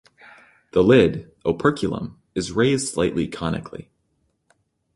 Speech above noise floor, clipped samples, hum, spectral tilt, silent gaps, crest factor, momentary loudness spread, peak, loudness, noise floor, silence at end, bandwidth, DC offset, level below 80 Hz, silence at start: 49 dB; under 0.1%; none; -5.5 dB/octave; none; 20 dB; 15 LU; -2 dBFS; -21 LUFS; -69 dBFS; 1.15 s; 11.5 kHz; under 0.1%; -46 dBFS; 0.75 s